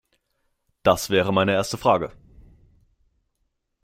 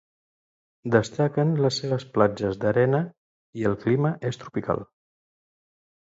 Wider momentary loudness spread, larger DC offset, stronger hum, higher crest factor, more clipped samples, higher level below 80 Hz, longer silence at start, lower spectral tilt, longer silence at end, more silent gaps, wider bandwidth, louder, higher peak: second, 4 LU vs 9 LU; neither; neither; about the same, 22 dB vs 22 dB; neither; about the same, -54 dBFS vs -58 dBFS; about the same, 0.85 s vs 0.85 s; second, -4.5 dB/octave vs -7 dB/octave; first, 1.75 s vs 1.3 s; second, none vs 3.18-3.53 s; first, 16 kHz vs 7.8 kHz; first, -21 LUFS vs -25 LUFS; about the same, -4 dBFS vs -4 dBFS